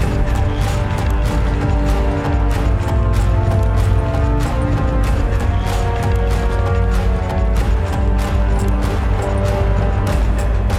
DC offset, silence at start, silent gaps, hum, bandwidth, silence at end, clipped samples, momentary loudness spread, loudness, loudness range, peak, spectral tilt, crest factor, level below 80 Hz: 0.2%; 0 s; none; none; 12.5 kHz; 0 s; under 0.1%; 2 LU; -18 LUFS; 1 LU; -4 dBFS; -7 dB/octave; 12 dB; -18 dBFS